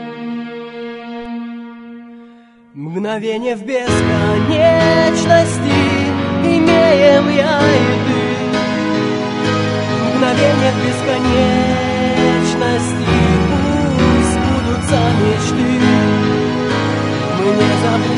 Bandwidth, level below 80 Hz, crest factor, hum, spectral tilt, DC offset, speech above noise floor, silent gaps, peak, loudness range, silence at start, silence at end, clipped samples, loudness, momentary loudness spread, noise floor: 11 kHz; -34 dBFS; 14 dB; none; -6 dB/octave; under 0.1%; 30 dB; none; 0 dBFS; 7 LU; 0 s; 0 s; under 0.1%; -14 LUFS; 14 LU; -43 dBFS